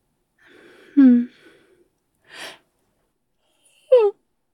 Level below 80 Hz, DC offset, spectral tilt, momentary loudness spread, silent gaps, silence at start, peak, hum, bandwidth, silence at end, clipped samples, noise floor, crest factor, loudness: -78 dBFS; under 0.1%; -6.5 dB/octave; 23 LU; none; 0.95 s; -4 dBFS; none; 11 kHz; 0.45 s; under 0.1%; -71 dBFS; 18 dB; -17 LUFS